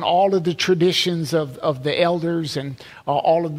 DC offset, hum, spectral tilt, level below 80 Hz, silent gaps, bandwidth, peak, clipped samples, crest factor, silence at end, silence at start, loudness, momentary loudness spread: under 0.1%; none; -5 dB/octave; -60 dBFS; none; 16 kHz; -4 dBFS; under 0.1%; 16 dB; 0 s; 0 s; -20 LUFS; 9 LU